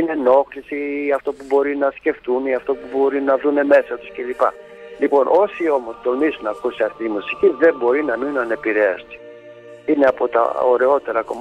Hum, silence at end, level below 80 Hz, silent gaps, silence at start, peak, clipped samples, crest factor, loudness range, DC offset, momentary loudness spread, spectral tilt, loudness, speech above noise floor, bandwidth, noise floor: none; 0 s; -58 dBFS; none; 0 s; -2 dBFS; under 0.1%; 16 dB; 2 LU; under 0.1%; 10 LU; -6 dB/octave; -18 LUFS; 22 dB; 8.8 kHz; -40 dBFS